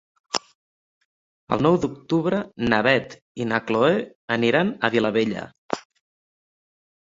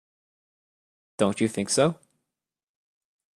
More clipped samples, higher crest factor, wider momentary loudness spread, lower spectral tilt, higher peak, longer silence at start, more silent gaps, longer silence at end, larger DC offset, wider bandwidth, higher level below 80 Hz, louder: neither; about the same, 22 dB vs 22 dB; second, 12 LU vs 19 LU; about the same, -5.5 dB/octave vs -4.5 dB/octave; first, -2 dBFS vs -8 dBFS; second, 0.35 s vs 1.2 s; first, 0.55-1.47 s, 3.22-3.35 s, 4.15-4.28 s, 5.58-5.69 s vs none; second, 1.25 s vs 1.4 s; neither; second, 8 kHz vs 13.5 kHz; first, -56 dBFS vs -66 dBFS; about the same, -23 LUFS vs -25 LUFS